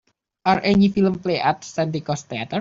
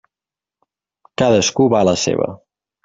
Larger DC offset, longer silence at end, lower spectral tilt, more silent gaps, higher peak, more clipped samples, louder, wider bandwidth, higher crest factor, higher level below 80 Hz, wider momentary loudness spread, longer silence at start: neither; second, 0 s vs 0.5 s; first, -6 dB/octave vs -4.5 dB/octave; neither; about the same, -4 dBFS vs -2 dBFS; neither; second, -21 LUFS vs -16 LUFS; about the same, 7.6 kHz vs 7.8 kHz; about the same, 18 dB vs 16 dB; about the same, -52 dBFS vs -54 dBFS; about the same, 10 LU vs 10 LU; second, 0.45 s vs 1.2 s